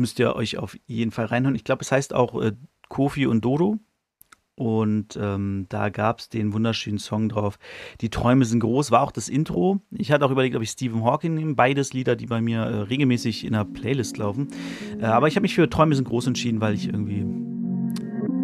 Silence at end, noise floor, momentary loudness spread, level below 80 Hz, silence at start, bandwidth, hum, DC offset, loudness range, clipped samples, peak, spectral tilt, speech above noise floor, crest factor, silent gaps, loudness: 0 s; -56 dBFS; 9 LU; -50 dBFS; 0 s; 14 kHz; none; under 0.1%; 3 LU; under 0.1%; -2 dBFS; -6 dB/octave; 34 dB; 20 dB; none; -24 LUFS